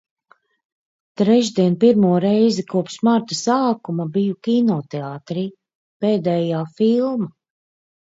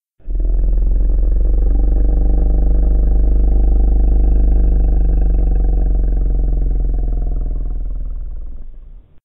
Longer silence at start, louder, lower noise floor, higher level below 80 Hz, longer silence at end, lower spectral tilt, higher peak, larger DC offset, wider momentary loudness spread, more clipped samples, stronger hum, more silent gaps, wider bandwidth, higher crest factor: first, 1.2 s vs 0.25 s; about the same, -19 LUFS vs -18 LUFS; first, -58 dBFS vs -35 dBFS; second, -66 dBFS vs -14 dBFS; first, 0.7 s vs 0.05 s; second, -6.5 dB/octave vs -14.5 dB/octave; about the same, -2 dBFS vs -4 dBFS; neither; about the same, 11 LU vs 11 LU; neither; neither; first, 5.75-6.00 s vs none; first, 7.8 kHz vs 1.7 kHz; first, 16 dB vs 10 dB